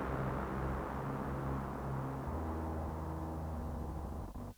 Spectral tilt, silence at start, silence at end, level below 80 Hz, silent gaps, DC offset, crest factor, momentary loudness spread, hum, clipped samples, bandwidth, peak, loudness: -8 dB/octave; 0 s; 0.05 s; -46 dBFS; none; under 0.1%; 14 dB; 4 LU; none; under 0.1%; over 20 kHz; -24 dBFS; -41 LUFS